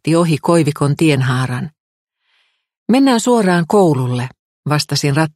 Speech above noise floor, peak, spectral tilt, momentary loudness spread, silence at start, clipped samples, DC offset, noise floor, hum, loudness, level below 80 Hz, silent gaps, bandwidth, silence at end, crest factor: 48 dB; 0 dBFS; -6 dB/octave; 12 LU; 0.05 s; under 0.1%; under 0.1%; -62 dBFS; none; -15 LUFS; -54 dBFS; 1.80-2.07 s, 2.78-2.86 s, 4.39-4.63 s; 15.5 kHz; 0.05 s; 14 dB